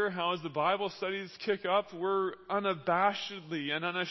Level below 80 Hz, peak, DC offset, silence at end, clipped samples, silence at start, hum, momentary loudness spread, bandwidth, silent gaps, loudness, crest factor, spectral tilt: -76 dBFS; -14 dBFS; under 0.1%; 0 s; under 0.1%; 0 s; none; 7 LU; 6 kHz; none; -32 LUFS; 18 dB; -5.5 dB/octave